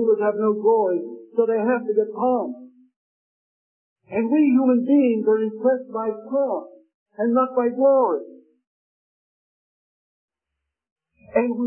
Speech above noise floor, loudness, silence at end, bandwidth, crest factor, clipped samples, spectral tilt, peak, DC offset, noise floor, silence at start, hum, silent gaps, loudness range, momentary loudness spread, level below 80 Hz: 63 dB; -21 LUFS; 0 s; 3.2 kHz; 16 dB; under 0.1%; -11.5 dB/octave; -8 dBFS; under 0.1%; -83 dBFS; 0 s; none; 2.96-3.96 s, 6.94-7.06 s, 8.67-10.28 s, 10.91-10.96 s; 5 LU; 10 LU; -74 dBFS